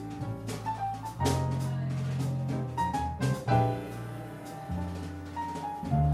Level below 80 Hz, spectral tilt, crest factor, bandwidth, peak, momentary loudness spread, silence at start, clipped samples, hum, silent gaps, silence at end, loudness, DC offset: -46 dBFS; -6.5 dB/octave; 18 dB; 14.5 kHz; -14 dBFS; 12 LU; 0 s; under 0.1%; none; none; 0 s; -32 LUFS; under 0.1%